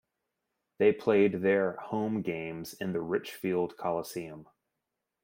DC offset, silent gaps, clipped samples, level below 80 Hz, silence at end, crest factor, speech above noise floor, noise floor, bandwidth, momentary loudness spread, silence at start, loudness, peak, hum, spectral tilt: under 0.1%; none; under 0.1%; -72 dBFS; 0.8 s; 18 dB; 56 dB; -86 dBFS; 16.5 kHz; 14 LU; 0.8 s; -30 LUFS; -12 dBFS; none; -6.5 dB/octave